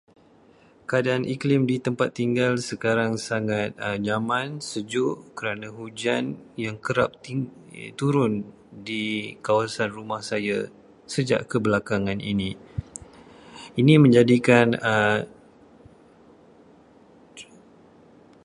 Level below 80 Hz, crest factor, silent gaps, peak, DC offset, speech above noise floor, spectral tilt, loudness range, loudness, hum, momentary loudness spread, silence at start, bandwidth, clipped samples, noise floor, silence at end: -56 dBFS; 24 dB; none; -2 dBFS; under 0.1%; 32 dB; -6 dB/octave; 7 LU; -24 LUFS; none; 18 LU; 0.9 s; 11.5 kHz; under 0.1%; -55 dBFS; 1 s